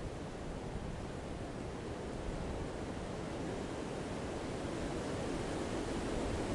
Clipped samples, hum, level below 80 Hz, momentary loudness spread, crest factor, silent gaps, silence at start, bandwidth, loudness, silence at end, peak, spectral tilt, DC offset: under 0.1%; none; -50 dBFS; 5 LU; 14 dB; none; 0 s; 11.5 kHz; -41 LUFS; 0 s; -26 dBFS; -5.5 dB/octave; under 0.1%